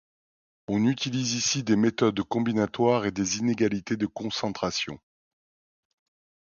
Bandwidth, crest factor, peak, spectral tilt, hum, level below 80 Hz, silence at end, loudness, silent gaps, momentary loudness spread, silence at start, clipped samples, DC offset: 7.4 kHz; 18 dB; -10 dBFS; -4.5 dB/octave; none; -60 dBFS; 1.5 s; -26 LUFS; none; 7 LU; 0.7 s; under 0.1%; under 0.1%